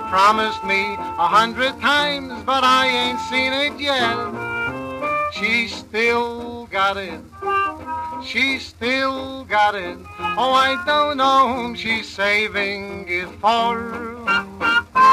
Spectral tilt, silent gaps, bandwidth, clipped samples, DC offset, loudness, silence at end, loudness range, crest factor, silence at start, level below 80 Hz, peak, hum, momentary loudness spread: -3.5 dB/octave; none; 15 kHz; under 0.1%; under 0.1%; -19 LUFS; 0 s; 4 LU; 16 dB; 0 s; -50 dBFS; -4 dBFS; none; 11 LU